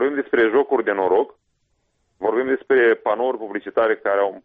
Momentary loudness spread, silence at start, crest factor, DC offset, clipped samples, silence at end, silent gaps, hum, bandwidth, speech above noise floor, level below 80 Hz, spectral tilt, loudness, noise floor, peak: 8 LU; 0 s; 14 dB; under 0.1%; under 0.1%; 0.05 s; none; none; 4.4 kHz; 50 dB; -64 dBFS; -7.5 dB/octave; -20 LUFS; -69 dBFS; -6 dBFS